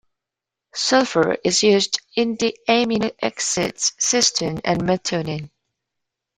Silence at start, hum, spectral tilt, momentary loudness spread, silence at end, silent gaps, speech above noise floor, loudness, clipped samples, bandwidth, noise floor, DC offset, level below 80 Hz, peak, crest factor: 0.75 s; none; -3 dB/octave; 8 LU; 0.9 s; none; 66 dB; -19 LUFS; under 0.1%; 15 kHz; -85 dBFS; under 0.1%; -56 dBFS; -4 dBFS; 18 dB